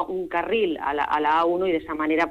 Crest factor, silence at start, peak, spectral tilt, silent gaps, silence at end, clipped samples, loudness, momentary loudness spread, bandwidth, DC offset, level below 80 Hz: 12 dB; 0 s; -12 dBFS; -6 dB/octave; none; 0 s; under 0.1%; -23 LUFS; 5 LU; 8.6 kHz; under 0.1%; -54 dBFS